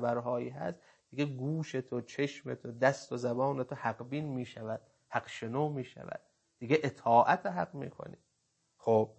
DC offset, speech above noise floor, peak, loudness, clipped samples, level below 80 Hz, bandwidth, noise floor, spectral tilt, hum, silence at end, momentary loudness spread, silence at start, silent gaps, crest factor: under 0.1%; 45 dB; -12 dBFS; -34 LUFS; under 0.1%; -76 dBFS; 8.6 kHz; -78 dBFS; -6.5 dB/octave; none; 0.05 s; 15 LU; 0 s; none; 22 dB